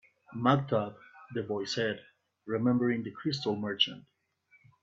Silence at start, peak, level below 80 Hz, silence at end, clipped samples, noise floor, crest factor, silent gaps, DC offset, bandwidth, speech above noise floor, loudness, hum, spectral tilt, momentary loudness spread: 0.3 s; -10 dBFS; -72 dBFS; 0.85 s; under 0.1%; -68 dBFS; 22 dB; none; under 0.1%; 7.8 kHz; 37 dB; -31 LUFS; none; -6 dB/octave; 14 LU